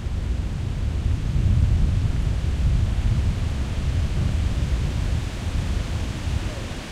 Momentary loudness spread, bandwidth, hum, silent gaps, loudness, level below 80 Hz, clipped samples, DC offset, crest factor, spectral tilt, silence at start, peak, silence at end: 6 LU; 12 kHz; none; none; -25 LUFS; -24 dBFS; under 0.1%; under 0.1%; 16 dB; -6.5 dB/octave; 0 s; -8 dBFS; 0 s